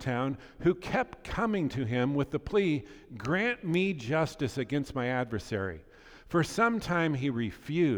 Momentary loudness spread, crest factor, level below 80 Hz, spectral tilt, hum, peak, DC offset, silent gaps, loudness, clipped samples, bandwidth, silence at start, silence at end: 7 LU; 18 dB; -52 dBFS; -6.5 dB/octave; none; -12 dBFS; under 0.1%; none; -31 LUFS; under 0.1%; 19.5 kHz; 0 s; 0 s